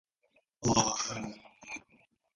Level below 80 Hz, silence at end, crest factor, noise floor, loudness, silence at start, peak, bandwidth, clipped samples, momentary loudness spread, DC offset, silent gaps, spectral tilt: -60 dBFS; 0.55 s; 26 dB; -73 dBFS; -31 LUFS; 0.6 s; -10 dBFS; 11.5 kHz; under 0.1%; 17 LU; under 0.1%; none; -3 dB/octave